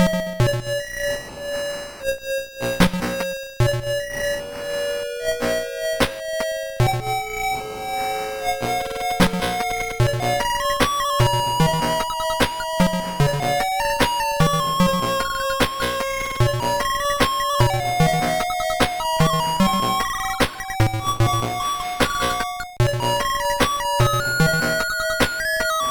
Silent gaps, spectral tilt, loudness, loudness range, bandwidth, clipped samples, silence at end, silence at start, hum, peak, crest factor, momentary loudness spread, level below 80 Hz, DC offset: none; -4.5 dB/octave; -21 LUFS; 4 LU; 18 kHz; under 0.1%; 0 s; 0 s; none; -2 dBFS; 20 dB; 7 LU; -36 dBFS; under 0.1%